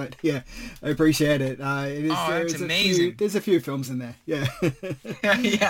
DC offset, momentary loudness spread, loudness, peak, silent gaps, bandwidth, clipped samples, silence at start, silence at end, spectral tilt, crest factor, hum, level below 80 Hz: under 0.1%; 12 LU; -24 LUFS; -8 dBFS; none; 17 kHz; under 0.1%; 0 s; 0 s; -4.5 dB/octave; 16 dB; none; -50 dBFS